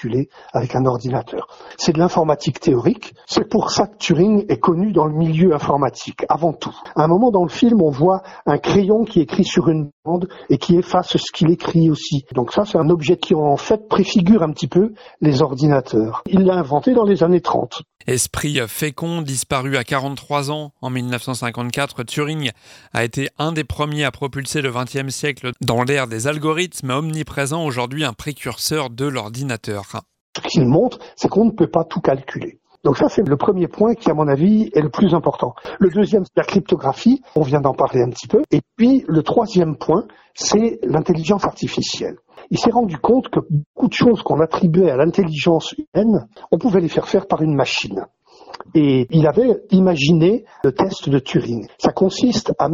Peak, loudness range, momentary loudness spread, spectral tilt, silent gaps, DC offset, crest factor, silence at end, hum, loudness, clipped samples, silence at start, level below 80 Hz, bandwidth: -2 dBFS; 6 LU; 9 LU; -6 dB/octave; 9.92-10.03 s, 30.21-30.33 s, 43.66-43.74 s, 45.87-45.92 s; under 0.1%; 16 dB; 0 s; none; -18 LUFS; under 0.1%; 0 s; -48 dBFS; 16 kHz